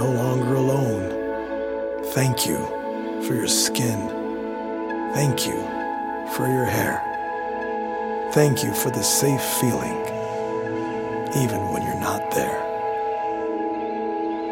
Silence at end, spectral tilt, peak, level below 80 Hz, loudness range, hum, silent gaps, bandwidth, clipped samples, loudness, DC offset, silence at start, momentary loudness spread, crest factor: 0 s; -4.5 dB/octave; -4 dBFS; -54 dBFS; 3 LU; none; none; 17 kHz; under 0.1%; -24 LUFS; under 0.1%; 0 s; 8 LU; 20 dB